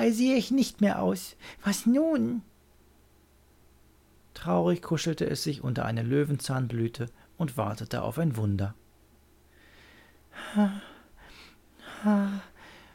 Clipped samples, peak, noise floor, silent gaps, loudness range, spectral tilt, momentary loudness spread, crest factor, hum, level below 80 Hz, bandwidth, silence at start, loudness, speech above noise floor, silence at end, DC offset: under 0.1%; -12 dBFS; -60 dBFS; none; 5 LU; -6 dB/octave; 14 LU; 18 dB; none; -58 dBFS; 17 kHz; 0 s; -29 LUFS; 33 dB; 0.15 s; under 0.1%